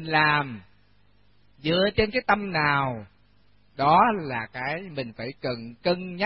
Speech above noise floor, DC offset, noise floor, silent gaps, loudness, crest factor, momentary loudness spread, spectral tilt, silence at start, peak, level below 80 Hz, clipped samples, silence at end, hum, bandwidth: 38 dB; 0.1%; -62 dBFS; none; -25 LUFS; 20 dB; 14 LU; -9.5 dB/octave; 0 s; -6 dBFS; -52 dBFS; under 0.1%; 0 s; 50 Hz at -55 dBFS; 5.8 kHz